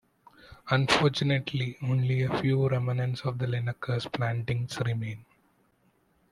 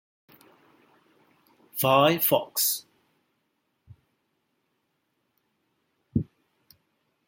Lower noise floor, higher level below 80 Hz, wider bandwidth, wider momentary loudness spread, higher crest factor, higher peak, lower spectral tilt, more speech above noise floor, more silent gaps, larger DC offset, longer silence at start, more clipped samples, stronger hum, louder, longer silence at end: second, -68 dBFS vs -76 dBFS; about the same, -60 dBFS vs -64 dBFS; second, 11.5 kHz vs 16.5 kHz; second, 8 LU vs 14 LU; about the same, 20 dB vs 24 dB; about the same, -8 dBFS vs -8 dBFS; first, -6 dB/octave vs -3.5 dB/octave; second, 40 dB vs 53 dB; neither; neither; second, 0.45 s vs 1.75 s; neither; neither; second, -28 LUFS vs -24 LUFS; about the same, 1.1 s vs 1.05 s